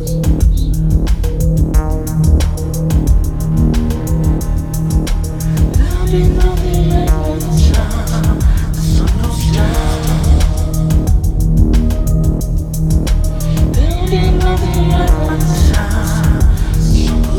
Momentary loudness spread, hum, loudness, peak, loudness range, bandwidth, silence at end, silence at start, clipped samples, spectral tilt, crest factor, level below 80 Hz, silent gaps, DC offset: 4 LU; none; -14 LUFS; 0 dBFS; 1 LU; 17 kHz; 0 s; 0 s; under 0.1%; -6.5 dB/octave; 12 dB; -14 dBFS; none; under 0.1%